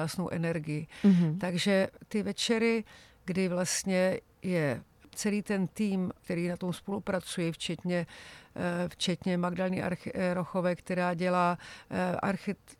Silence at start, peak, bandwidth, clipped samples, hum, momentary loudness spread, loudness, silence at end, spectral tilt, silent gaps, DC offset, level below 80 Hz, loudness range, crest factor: 0 s; -12 dBFS; 14.5 kHz; under 0.1%; none; 8 LU; -31 LUFS; 0.05 s; -5.5 dB/octave; none; under 0.1%; -64 dBFS; 4 LU; 18 dB